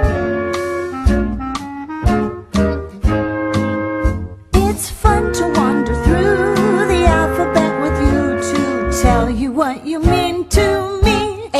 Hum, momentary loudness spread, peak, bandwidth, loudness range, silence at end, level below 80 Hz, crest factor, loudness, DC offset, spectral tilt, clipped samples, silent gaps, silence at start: none; 6 LU; 0 dBFS; 13 kHz; 4 LU; 0 s; -22 dBFS; 16 dB; -16 LUFS; under 0.1%; -6 dB/octave; under 0.1%; none; 0 s